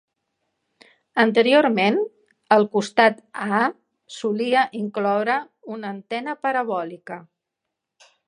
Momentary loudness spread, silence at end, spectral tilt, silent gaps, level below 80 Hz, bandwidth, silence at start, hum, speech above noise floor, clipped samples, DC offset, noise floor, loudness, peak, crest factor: 16 LU; 1.05 s; -5 dB/octave; none; -78 dBFS; 11 kHz; 1.15 s; none; 62 dB; under 0.1%; under 0.1%; -82 dBFS; -21 LUFS; 0 dBFS; 22 dB